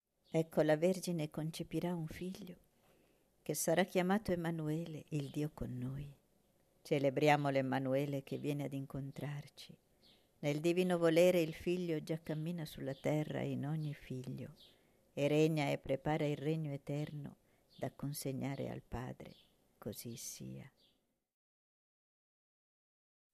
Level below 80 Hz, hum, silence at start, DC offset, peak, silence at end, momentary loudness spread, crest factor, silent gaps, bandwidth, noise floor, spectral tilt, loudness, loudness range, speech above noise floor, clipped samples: -66 dBFS; none; 0.35 s; under 0.1%; -16 dBFS; 2.65 s; 17 LU; 22 dB; none; 14 kHz; -78 dBFS; -6 dB/octave; -38 LUFS; 11 LU; 41 dB; under 0.1%